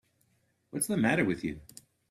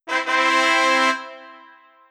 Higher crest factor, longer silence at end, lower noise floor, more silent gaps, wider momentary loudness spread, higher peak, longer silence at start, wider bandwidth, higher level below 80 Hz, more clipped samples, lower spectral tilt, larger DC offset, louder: about the same, 20 dB vs 18 dB; about the same, 0.5 s vs 0.55 s; first, -73 dBFS vs -49 dBFS; neither; first, 15 LU vs 11 LU; second, -12 dBFS vs -2 dBFS; first, 0.75 s vs 0.05 s; about the same, 15.5 kHz vs 14.5 kHz; first, -62 dBFS vs under -90 dBFS; neither; first, -5 dB/octave vs 1 dB/octave; neither; second, -30 LUFS vs -17 LUFS